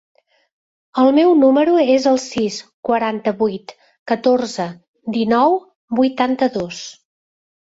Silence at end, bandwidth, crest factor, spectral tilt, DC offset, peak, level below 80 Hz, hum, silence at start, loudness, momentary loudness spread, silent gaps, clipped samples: 0.85 s; 8 kHz; 16 dB; -5 dB/octave; under 0.1%; -2 dBFS; -60 dBFS; none; 0.95 s; -17 LUFS; 15 LU; 2.74-2.83 s, 3.99-4.06 s, 4.88-4.94 s, 5.75-5.88 s; under 0.1%